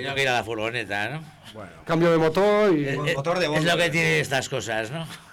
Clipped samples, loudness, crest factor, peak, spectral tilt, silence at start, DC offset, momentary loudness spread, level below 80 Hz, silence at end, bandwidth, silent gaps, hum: under 0.1%; -23 LUFS; 10 dB; -14 dBFS; -5 dB/octave; 0 s; under 0.1%; 15 LU; -54 dBFS; 0 s; 18 kHz; none; none